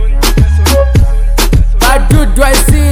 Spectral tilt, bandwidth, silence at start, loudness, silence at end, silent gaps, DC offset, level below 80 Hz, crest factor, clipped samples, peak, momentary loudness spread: -5 dB/octave; 16 kHz; 0 s; -9 LUFS; 0 s; none; under 0.1%; -8 dBFS; 6 dB; 2%; 0 dBFS; 3 LU